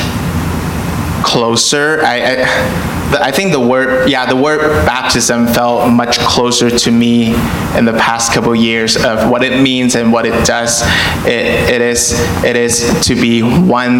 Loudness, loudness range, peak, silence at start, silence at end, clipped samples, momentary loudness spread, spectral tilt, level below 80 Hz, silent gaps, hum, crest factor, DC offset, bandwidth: -11 LUFS; 1 LU; 0 dBFS; 0 s; 0 s; under 0.1%; 4 LU; -4 dB/octave; -32 dBFS; none; none; 10 dB; under 0.1%; 17 kHz